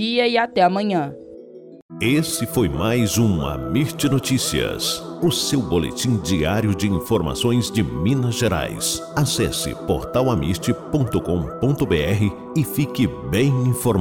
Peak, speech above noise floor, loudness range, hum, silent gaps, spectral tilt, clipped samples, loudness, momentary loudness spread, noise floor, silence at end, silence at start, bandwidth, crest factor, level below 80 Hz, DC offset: -6 dBFS; 20 dB; 1 LU; none; 1.82-1.89 s; -5 dB/octave; under 0.1%; -20 LUFS; 5 LU; -40 dBFS; 0 s; 0 s; 17.5 kHz; 14 dB; -40 dBFS; under 0.1%